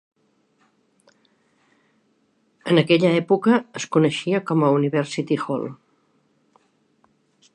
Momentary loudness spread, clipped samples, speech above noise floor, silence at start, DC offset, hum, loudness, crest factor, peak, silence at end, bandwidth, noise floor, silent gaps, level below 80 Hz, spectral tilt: 9 LU; under 0.1%; 46 dB; 2.65 s; under 0.1%; none; -20 LUFS; 20 dB; -2 dBFS; 1.8 s; 10.5 kHz; -65 dBFS; none; -72 dBFS; -6 dB/octave